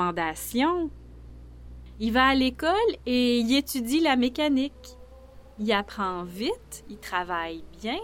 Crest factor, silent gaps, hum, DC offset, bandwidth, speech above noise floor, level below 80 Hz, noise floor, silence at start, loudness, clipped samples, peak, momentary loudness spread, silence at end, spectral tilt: 18 dB; none; none; under 0.1%; 17 kHz; 22 dB; -48 dBFS; -48 dBFS; 0 s; -26 LUFS; under 0.1%; -8 dBFS; 14 LU; 0 s; -4 dB/octave